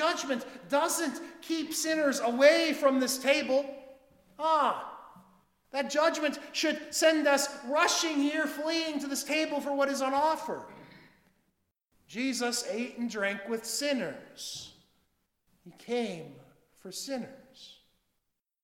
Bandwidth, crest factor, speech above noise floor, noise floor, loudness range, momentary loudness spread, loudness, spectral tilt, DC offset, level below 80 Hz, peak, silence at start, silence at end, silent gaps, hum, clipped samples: 18 kHz; 22 dB; 52 dB; -82 dBFS; 12 LU; 15 LU; -29 LUFS; -2 dB/octave; under 0.1%; -76 dBFS; -8 dBFS; 0 s; 0.9 s; none; none; under 0.1%